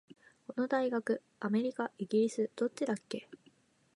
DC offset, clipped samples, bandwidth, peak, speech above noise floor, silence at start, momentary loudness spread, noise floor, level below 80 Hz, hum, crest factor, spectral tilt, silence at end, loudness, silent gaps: under 0.1%; under 0.1%; 11.5 kHz; -18 dBFS; 34 dB; 0.5 s; 12 LU; -68 dBFS; -86 dBFS; none; 16 dB; -6 dB/octave; 0.6 s; -35 LUFS; none